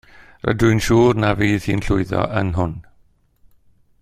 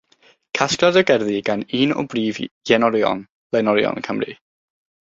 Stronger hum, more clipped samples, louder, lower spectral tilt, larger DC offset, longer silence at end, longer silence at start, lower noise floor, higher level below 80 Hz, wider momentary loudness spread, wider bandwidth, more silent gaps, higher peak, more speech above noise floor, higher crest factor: neither; neither; about the same, -18 LUFS vs -19 LUFS; first, -6.5 dB/octave vs -4.5 dB/octave; neither; first, 1.2 s vs 0.8 s; second, 0.2 s vs 0.55 s; about the same, -56 dBFS vs -56 dBFS; first, -36 dBFS vs -60 dBFS; about the same, 10 LU vs 11 LU; first, 15 kHz vs 7.8 kHz; second, none vs 2.51-2.61 s, 3.32-3.50 s; about the same, -2 dBFS vs 0 dBFS; about the same, 39 dB vs 38 dB; about the same, 18 dB vs 20 dB